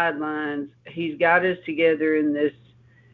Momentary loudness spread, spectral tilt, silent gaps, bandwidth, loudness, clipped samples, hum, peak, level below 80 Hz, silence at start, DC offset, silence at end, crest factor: 12 LU; -8.5 dB/octave; none; 4.6 kHz; -23 LUFS; under 0.1%; none; -4 dBFS; -66 dBFS; 0 s; under 0.1%; 0.65 s; 20 dB